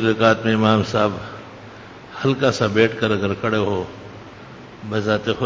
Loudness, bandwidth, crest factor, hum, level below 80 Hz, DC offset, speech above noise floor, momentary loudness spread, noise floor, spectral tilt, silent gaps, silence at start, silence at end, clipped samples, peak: -19 LUFS; 7.8 kHz; 20 dB; none; -48 dBFS; under 0.1%; 21 dB; 22 LU; -39 dBFS; -6 dB/octave; none; 0 s; 0 s; under 0.1%; -2 dBFS